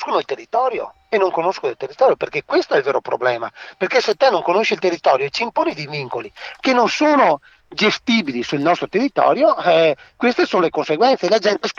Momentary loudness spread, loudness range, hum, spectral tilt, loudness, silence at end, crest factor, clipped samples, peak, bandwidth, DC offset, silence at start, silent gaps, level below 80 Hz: 10 LU; 3 LU; none; -4.5 dB/octave; -18 LUFS; 0.05 s; 16 dB; under 0.1%; -2 dBFS; 7.6 kHz; under 0.1%; 0 s; none; -62 dBFS